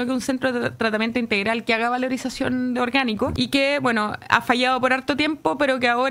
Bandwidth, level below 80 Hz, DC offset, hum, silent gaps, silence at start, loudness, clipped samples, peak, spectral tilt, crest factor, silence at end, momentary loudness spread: 16 kHz; -52 dBFS; under 0.1%; none; none; 0 s; -21 LUFS; under 0.1%; 0 dBFS; -4.5 dB/octave; 20 dB; 0 s; 5 LU